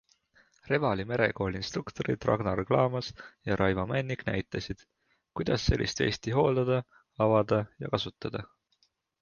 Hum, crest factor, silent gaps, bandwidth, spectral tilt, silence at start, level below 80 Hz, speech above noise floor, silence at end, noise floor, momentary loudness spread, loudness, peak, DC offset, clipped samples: none; 20 dB; none; 7.2 kHz; -6 dB/octave; 0.65 s; -46 dBFS; 44 dB; 0.75 s; -73 dBFS; 12 LU; -30 LUFS; -10 dBFS; under 0.1%; under 0.1%